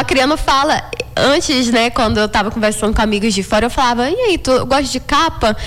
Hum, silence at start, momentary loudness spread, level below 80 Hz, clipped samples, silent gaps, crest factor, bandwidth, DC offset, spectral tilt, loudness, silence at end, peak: none; 0 s; 3 LU; -30 dBFS; under 0.1%; none; 10 dB; 18.5 kHz; under 0.1%; -3.5 dB/octave; -14 LUFS; 0 s; -6 dBFS